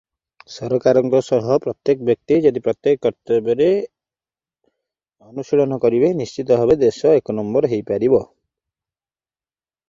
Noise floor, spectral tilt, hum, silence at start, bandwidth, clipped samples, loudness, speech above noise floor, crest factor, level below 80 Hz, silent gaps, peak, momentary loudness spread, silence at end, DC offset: under -90 dBFS; -7.5 dB/octave; none; 0.5 s; 7.6 kHz; under 0.1%; -18 LUFS; over 73 dB; 16 dB; -56 dBFS; none; -2 dBFS; 7 LU; 1.65 s; under 0.1%